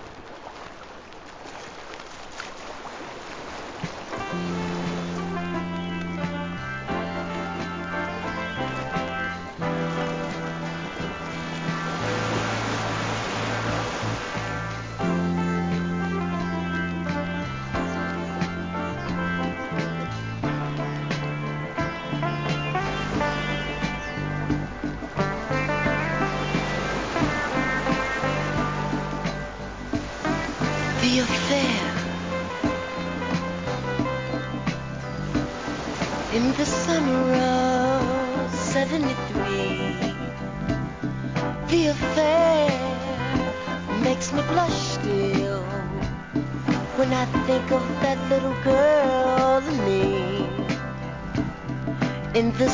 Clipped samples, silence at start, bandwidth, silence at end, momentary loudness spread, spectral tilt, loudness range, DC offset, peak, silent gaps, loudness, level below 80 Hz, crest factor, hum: under 0.1%; 0 s; 7.6 kHz; 0 s; 10 LU; -5.5 dB/octave; 7 LU; 0.2%; -8 dBFS; none; -26 LUFS; -42 dBFS; 18 dB; none